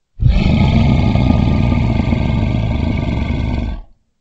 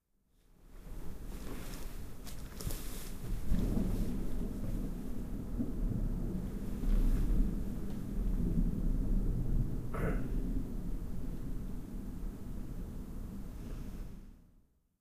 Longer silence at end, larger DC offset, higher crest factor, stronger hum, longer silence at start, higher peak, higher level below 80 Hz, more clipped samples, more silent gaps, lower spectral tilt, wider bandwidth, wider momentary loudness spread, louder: second, 0.4 s vs 0.55 s; neither; about the same, 14 dB vs 16 dB; neither; second, 0.15 s vs 0.6 s; first, 0 dBFS vs -18 dBFS; first, -20 dBFS vs -38 dBFS; neither; neither; first, -8.5 dB/octave vs -7 dB/octave; second, 7.8 kHz vs 15.5 kHz; second, 7 LU vs 12 LU; first, -15 LUFS vs -40 LUFS